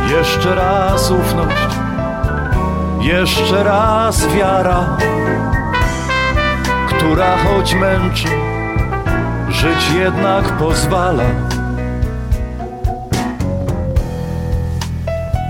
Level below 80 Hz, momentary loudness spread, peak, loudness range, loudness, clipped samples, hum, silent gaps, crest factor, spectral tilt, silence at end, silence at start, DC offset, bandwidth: -22 dBFS; 7 LU; -2 dBFS; 5 LU; -15 LUFS; under 0.1%; none; none; 12 dB; -5.5 dB/octave; 0 s; 0 s; under 0.1%; 17 kHz